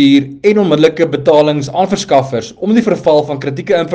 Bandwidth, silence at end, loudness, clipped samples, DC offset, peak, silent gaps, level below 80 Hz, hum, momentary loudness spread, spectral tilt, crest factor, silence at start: 9 kHz; 0 s; -12 LUFS; 0.2%; under 0.1%; 0 dBFS; none; -50 dBFS; none; 7 LU; -6 dB/octave; 12 dB; 0 s